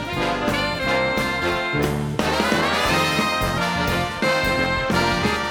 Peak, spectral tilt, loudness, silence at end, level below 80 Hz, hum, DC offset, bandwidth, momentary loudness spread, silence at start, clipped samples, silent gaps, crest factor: -4 dBFS; -4.5 dB/octave; -20 LUFS; 0 s; -38 dBFS; none; under 0.1%; over 20 kHz; 4 LU; 0 s; under 0.1%; none; 18 dB